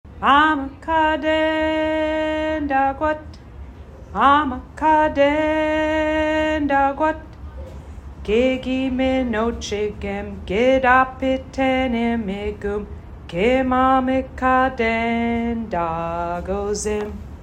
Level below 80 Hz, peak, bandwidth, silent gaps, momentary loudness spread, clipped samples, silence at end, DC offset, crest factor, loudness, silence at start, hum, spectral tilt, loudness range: -38 dBFS; -2 dBFS; 11 kHz; none; 15 LU; under 0.1%; 0 s; under 0.1%; 18 dB; -20 LUFS; 0.05 s; none; -5.5 dB/octave; 3 LU